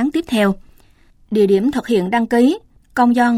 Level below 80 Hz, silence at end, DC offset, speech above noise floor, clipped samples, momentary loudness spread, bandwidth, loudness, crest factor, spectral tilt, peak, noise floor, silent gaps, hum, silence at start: -48 dBFS; 0 s; under 0.1%; 35 dB; under 0.1%; 10 LU; 14.5 kHz; -17 LUFS; 14 dB; -6.5 dB/octave; -4 dBFS; -50 dBFS; none; none; 0 s